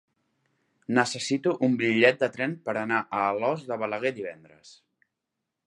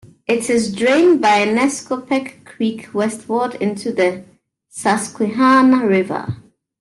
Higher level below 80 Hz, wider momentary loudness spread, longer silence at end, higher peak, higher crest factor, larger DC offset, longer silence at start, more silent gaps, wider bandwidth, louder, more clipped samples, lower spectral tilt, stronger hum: second, -74 dBFS vs -60 dBFS; about the same, 10 LU vs 12 LU; first, 1 s vs 0.45 s; about the same, -4 dBFS vs -2 dBFS; first, 22 dB vs 14 dB; neither; first, 0.9 s vs 0.3 s; neither; about the same, 11.5 kHz vs 12.5 kHz; second, -26 LUFS vs -17 LUFS; neither; about the same, -5 dB/octave vs -4.5 dB/octave; neither